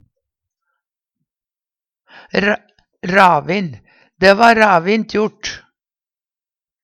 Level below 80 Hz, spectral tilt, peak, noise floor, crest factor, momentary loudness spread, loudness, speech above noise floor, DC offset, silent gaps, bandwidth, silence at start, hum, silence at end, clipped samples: -52 dBFS; -5 dB/octave; 0 dBFS; under -90 dBFS; 18 dB; 17 LU; -14 LUFS; over 77 dB; under 0.1%; none; 16.5 kHz; 2.35 s; none; 1.25 s; under 0.1%